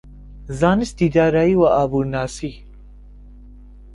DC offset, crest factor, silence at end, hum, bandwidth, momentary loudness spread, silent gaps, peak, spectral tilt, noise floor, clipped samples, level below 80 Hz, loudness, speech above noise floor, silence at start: under 0.1%; 18 dB; 0 s; 50 Hz at -40 dBFS; 11.5 kHz; 15 LU; none; -2 dBFS; -7 dB/octave; -41 dBFS; under 0.1%; -38 dBFS; -18 LUFS; 24 dB; 0.05 s